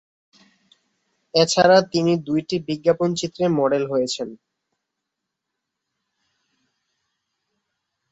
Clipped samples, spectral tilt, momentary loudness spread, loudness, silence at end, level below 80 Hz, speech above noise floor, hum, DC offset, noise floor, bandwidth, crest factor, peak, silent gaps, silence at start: under 0.1%; -4.5 dB/octave; 10 LU; -20 LUFS; 3.75 s; -64 dBFS; 62 dB; none; under 0.1%; -82 dBFS; 8.4 kHz; 22 dB; -2 dBFS; none; 1.35 s